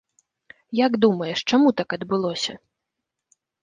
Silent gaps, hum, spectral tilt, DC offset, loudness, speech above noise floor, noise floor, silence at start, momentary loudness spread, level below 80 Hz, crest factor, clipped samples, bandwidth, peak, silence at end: none; none; -5 dB/octave; under 0.1%; -22 LUFS; 62 dB; -83 dBFS; 0.7 s; 9 LU; -66 dBFS; 20 dB; under 0.1%; 9.6 kHz; -4 dBFS; 1.05 s